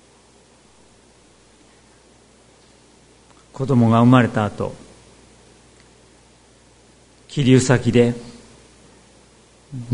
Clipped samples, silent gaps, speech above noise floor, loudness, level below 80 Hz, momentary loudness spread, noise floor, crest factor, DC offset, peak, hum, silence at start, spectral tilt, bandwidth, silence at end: under 0.1%; none; 36 dB; -17 LUFS; -52 dBFS; 24 LU; -52 dBFS; 22 dB; under 0.1%; 0 dBFS; none; 3.6 s; -6.5 dB/octave; 10.5 kHz; 0 s